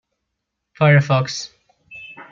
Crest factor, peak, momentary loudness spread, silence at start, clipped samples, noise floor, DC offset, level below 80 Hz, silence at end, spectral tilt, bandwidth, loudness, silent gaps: 18 dB; -2 dBFS; 22 LU; 0.8 s; under 0.1%; -78 dBFS; under 0.1%; -60 dBFS; 0.1 s; -6 dB/octave; 7.4 kHz; -17 LUFS; none